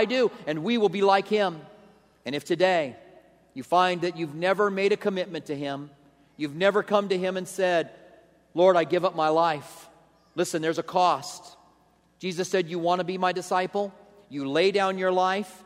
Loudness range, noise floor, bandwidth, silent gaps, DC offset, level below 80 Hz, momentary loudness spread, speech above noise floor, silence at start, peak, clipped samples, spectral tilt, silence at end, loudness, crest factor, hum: 3 LU; -62 dBFS; 15 kHz; none; under 0.1%; -74 dBFS; 13 LU; 38 dB; 0 s; -6 dBFS; under 0.1%; -5 dB/octave; 0.1 s; -25 LUFS; 20 dB; none